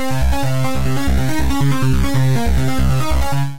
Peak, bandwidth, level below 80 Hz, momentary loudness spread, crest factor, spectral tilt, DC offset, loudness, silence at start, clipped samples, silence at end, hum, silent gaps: -6 dBFS; 16 kHz; -22 dBFS; 3 LU; 10 dB; -6 dB/octave; 10%; -18 LUFS; 0 s; under 0.1%; 0 s; none; none